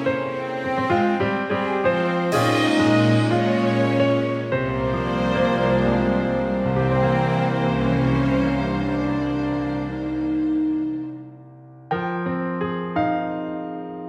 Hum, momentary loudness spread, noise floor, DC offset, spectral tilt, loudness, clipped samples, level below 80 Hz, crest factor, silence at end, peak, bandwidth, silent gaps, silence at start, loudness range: none; 8 LU; -43 dBFS; under 0.1%; -7 dB/octave; -22 LUFS; under 0.1%; -42 dBFS; 16 dB; 0 s; -6 dBFS; 14 kHz; none; 0 s; 6 LU